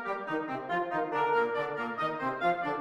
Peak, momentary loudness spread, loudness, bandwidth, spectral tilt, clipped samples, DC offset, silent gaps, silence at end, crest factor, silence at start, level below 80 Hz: -16 dBFS; 6 LU; -31 LUFS; 11 kHz; -6.5 dB/octave; under 0.1%; under 0.1%; none; 0 s; 14 dB; 0 s; -72 dBFS